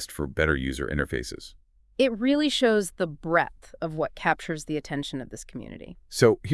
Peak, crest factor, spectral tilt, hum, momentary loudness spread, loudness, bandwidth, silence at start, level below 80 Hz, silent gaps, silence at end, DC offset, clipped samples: -6 dBFS; 20 dB; -5 dB/octave; none; 18 LU; -26 LUFS; 12 kHz; 0 s; -44 dBFS; none; 0 s; under 0.1%; under 0.1%